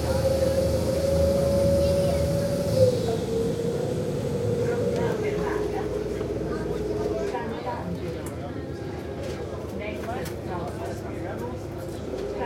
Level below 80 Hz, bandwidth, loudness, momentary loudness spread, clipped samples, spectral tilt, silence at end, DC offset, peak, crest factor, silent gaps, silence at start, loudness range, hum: -42 dBFS; 16.5 kHz; -27 LUFS; 11 LU; under 0.1%; -6.5 dB/octave; 0 s; under 0.1%; -6 dBFS; 20 dB; none; 0 s; 9 LU; none